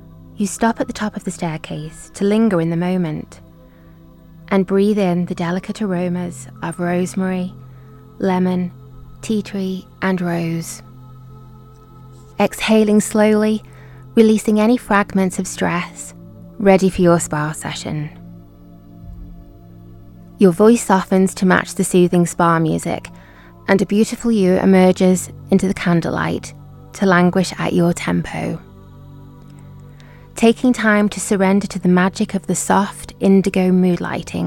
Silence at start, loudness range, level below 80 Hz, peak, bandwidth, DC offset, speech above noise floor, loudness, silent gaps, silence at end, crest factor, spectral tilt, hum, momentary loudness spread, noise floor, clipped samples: 0.15 s; 7 LU; -46 dBFS; 0 dBFS; 16 kHz; under 0.1%; 27 dB; -17 LUFS; none; 0 s; 18 dB; -6 dB/octave; none; 14 LU; -43 dBFS; under 0.1%